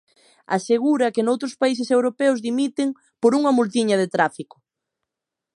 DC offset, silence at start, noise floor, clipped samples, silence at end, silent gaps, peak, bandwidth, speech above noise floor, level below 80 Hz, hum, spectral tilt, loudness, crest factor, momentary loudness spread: under 0.1%; 0.5 s; -85 dBFS; under 0.1%; 1.15 s; none; -4 dBFS; 11 kHz; 65 dB; -74 dBFS; none; -5 dB/octave; -21 LUFS; 18 dB; 7 LU